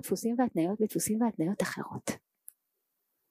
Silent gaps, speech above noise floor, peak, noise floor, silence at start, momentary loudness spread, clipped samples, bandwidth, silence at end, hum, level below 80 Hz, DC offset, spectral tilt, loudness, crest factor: none; 51 dB; -16 dBFS; -82 dBFS; 0.05 s; 9 LU; under 0.1%; 15.5 kHz; 1.15 s; none; -72 dBFS; under 0.1%; -5 dB/octave; -31 LUFS; 16 dB